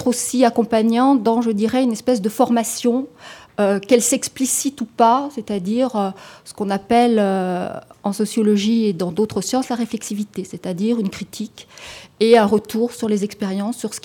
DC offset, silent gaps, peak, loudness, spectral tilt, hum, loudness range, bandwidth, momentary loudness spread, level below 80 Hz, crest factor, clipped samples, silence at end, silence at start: under 0.1%; none; -2 dBFS; -19 LUFS; -4.5 dB/octave; none; 3 LU; 18 kHz; 13 LU; -60 dBFS; 16 dB; under 0.1%; 0.05 s; 0 s